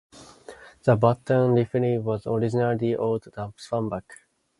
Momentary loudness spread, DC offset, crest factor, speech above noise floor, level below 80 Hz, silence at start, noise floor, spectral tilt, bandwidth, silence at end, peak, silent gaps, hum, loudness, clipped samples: 11 LU; under 0.1%; 20 dB; 23 dB; -58 dBFS; 0.15 s; -47 dBFS; -8.5 dB/octave; 11.5 kHz; 0.45 s; -4 dBFS; none; none; -24 LUFS; under 0.1%